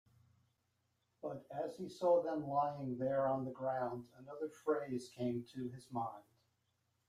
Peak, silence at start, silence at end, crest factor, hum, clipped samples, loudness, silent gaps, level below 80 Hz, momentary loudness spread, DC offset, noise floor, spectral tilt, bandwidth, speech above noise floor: -22 dBFS; 1.25 s; 0.9 s; 18 dB; none; under 0.1%; -40 LUFS; none; -80 dBFS; 13 LU; under 0.1%; -82 dBFS; -7.5 dB/octave; 13.5 kHz; 43 dB